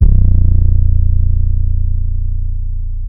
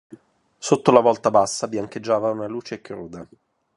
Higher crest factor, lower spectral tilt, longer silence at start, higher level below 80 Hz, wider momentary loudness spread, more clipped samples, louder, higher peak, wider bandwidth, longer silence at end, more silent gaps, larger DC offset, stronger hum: second, 10 dB vs 22 dB; first, -14 dB/octave vs -5 dB/octave; about the same, 0 s vs 0.1 s; first, -12 dBFS vs -62 dBFS; second, 10 LU vs 19 LU; first, 3% vs under 0.1%; first, -16 LUFS vs -20 LUFS; about the same, 0 dBFS vs 0 dBFS; second, 0.9 kHz vs 11.5 kHz; second, 0 s vs 0.5 s; neither; first, 10% vs under 0.1%; first, 60 Hz at -35 dBFS vs none